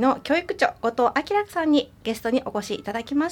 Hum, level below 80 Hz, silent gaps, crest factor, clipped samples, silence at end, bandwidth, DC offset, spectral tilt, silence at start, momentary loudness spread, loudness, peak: none; -56 dBFS; none; 18 dB; under 0.1%; 0 s; 18 kHz; under 0.1%; -4.5 dB/octave; 0 s; 8 LU; -24 LUFS; -6 dBFS